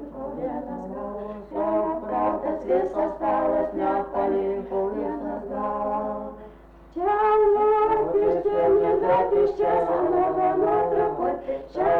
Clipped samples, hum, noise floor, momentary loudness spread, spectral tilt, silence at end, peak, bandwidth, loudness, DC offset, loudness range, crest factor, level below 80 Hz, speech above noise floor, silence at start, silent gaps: under 0.1%; none; -47 dBFS; 13 LU; -8.5 dB/octave; 0 s; -12 dBFS; 4.6 kHz; -24 LUFS; under 0.1%; 6 LU; 12 dB; -50 dBFS; 23 dB; 0 s; none